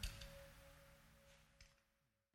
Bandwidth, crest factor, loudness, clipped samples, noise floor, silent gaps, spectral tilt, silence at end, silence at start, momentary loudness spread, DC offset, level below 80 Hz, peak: 18 kHz; 28 dB; -61 LUFS; under 0.1%; -85 dBFS; none; -3 dB/octave; 0.5 s; 0 s; 13 LU; under 0.1%; -62 dBFS; -32 dBFS